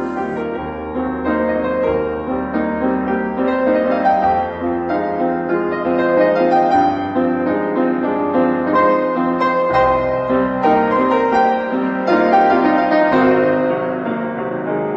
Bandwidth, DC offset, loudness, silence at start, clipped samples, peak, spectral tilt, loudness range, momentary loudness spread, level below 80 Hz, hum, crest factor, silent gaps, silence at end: 7.2 kHz; under 0.1%; -16 LUFS; 0 s; under 0.1%; -2 dBFS; -8 dB/octave; 3 LU; 8 LU; -44 dBFS; none; 14 dB; none; 0 s